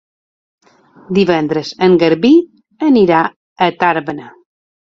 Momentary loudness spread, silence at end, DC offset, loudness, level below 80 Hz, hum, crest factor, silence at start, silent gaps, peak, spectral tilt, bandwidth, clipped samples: 10 LU; 0.65 s; under 0.1%; -13 LUFS; -54 dBFS; none; 14 dB; 1.1 s; 3.36-3.56 s; 0 dBFS; -7 dB/octave; 7.4 kHz; under 0.1%